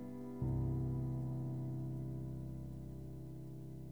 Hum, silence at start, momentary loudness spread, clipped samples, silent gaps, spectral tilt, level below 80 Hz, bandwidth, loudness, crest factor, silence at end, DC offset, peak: none; 0 s; 11 LU; under 0.1%; none; -10.5 dB/octave; -54 dBFS; 2.2 kHz; -43 LUFS; 14 dB; 0 s; 0.1%; -28 dBFS